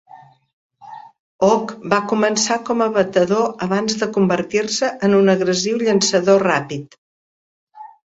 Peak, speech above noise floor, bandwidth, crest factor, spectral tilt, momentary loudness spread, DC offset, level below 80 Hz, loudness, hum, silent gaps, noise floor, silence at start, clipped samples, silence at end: 0 dBFS; 22 dB; 8 kHz; 18 dB; -4 dB/octave; 6 LU; under 0.1%; -60 dBFS; -17 LUFS; none; 0.53-0.70 s, 1.19-1.39 s, 6.98-7.67 s; -39 dBFS; 0.15 s; under 0.1%; 0.25 s